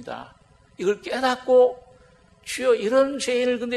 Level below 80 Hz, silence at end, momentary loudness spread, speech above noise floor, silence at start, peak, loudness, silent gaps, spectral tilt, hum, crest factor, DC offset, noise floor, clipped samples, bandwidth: -60 dBFS; 0 s; 19 LU; 33 dB; 0 s; -8 dBFS; -22 LUFS; none; -3.5 dB/octave; none; 16 dB; under 0.1%; -54 dBFS; under 0.1%; 12.5 kHz